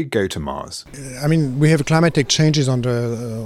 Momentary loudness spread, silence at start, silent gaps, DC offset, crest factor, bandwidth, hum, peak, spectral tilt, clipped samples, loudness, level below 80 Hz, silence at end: 14 LU; 0 s; none; under 0.1%; 16 dB; 13 kHz; none; -2 dBFS; -5.5 dB/octave; under 0.1%; -18 LUFS; -46 dBFS; 0 s